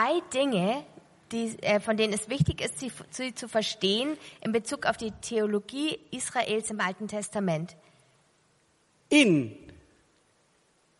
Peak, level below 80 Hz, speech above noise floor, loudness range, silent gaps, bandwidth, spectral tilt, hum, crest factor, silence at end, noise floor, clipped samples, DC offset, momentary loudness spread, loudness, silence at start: -8 dBFS; -56 dBFS; 39 dB; 3 LU; none; 11.5 kHz; -4.5 dB/octave; none; 22 dB; 1.25 s; -67 dBFS; under 0.1%; under 0.1%; 11 LU; -28 LUFS; 0 s